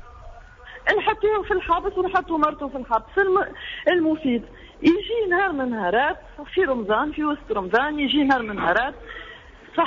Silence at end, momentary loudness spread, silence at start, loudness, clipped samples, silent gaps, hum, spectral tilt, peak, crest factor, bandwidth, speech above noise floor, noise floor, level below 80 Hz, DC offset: 0 s; 9 LU; 0 s; -22 LUFS; under 0.1%; none; none; -2 dB/octave; -8 dBFS; 16 dB; 7.4 kHz; 21 dB; -43 dBFS; -46 dBFS; under 0.1%